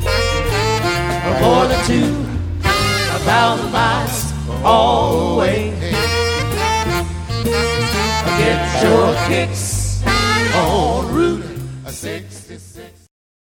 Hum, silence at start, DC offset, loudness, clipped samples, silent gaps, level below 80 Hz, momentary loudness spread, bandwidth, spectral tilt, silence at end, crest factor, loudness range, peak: none; 0 s; under 0.1%; -16 LUFS; under 0.1%; none; -28 dBFS; 10 LU; 19 kHz; -4.5 dB/octave; 0.65 s; 16 dB; 3 LU; 0 dBFS